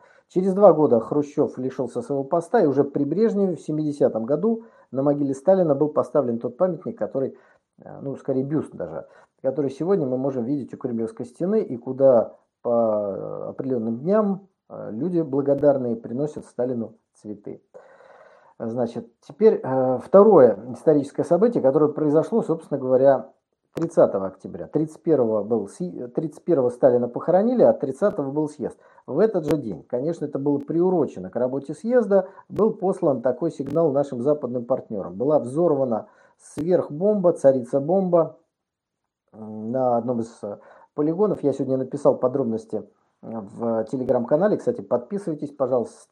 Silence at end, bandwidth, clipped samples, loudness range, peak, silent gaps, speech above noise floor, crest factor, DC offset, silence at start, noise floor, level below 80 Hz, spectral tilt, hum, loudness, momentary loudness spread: 0.2 s; 10.5 kHz; under 0.1%; 7 LU; -2 dBFS; none; 61 dB; 20 dB; under 0.1%; 0.35 s; -83 dBFS; -68 dBFS; -9 dB/octave; none; -22 LUFS; 14 LU